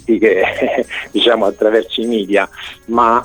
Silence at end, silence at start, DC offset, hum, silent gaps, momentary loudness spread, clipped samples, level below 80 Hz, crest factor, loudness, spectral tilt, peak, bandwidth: 0 s; 0.1 s; 0.2%; none; none; 7 LU; under 0.1%; -48 dBFS; 14 dB; -15 LUFS; -4.5 dB/octave; 0 dBFS; 19 kHz